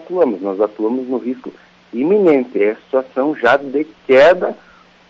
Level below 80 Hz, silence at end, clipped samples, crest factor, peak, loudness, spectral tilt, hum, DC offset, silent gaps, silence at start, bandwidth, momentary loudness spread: -56 dBFS; 0.55 s; under 0.1%; 12 dB; -2 dBFS; -15 LUFS; -6.5 dB/octave; none; under 0.1%; none; 0 s; 7.6 kHz; 14 LU